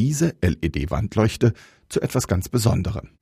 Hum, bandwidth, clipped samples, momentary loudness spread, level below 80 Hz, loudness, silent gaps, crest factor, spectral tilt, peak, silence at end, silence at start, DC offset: none; 15.5 kHz; under 0.1%; 7 LU; -36 dBFS; -23 LUFS; none; 16 dB; -6 dB/octave; -6 dBFS; 0.15 s; 0 s; under 0.1%